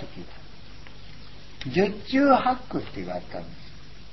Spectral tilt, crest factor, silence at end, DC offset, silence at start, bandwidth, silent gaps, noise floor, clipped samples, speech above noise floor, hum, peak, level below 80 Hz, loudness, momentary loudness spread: -7 dB/octave; 22 dB; 0.1 s; 1%; 0 s; 6 kHz; none; -46 dBFS; under 0.1%; 22 dB; none; -6 dBFS; -50 dBFS; -25 LUFS; 27 LU